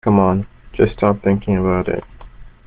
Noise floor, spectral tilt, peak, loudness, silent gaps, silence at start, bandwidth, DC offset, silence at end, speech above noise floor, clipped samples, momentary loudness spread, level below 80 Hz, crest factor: -38 dBFS; -8 dB/octave; -2 dBFS; -18 LUFS; none; 0.05 s; 4.5 kHz; under 0.1%; 0.15 s; 21 dB; under 0.1%; 9 LU; -36 dBFS; 16 dB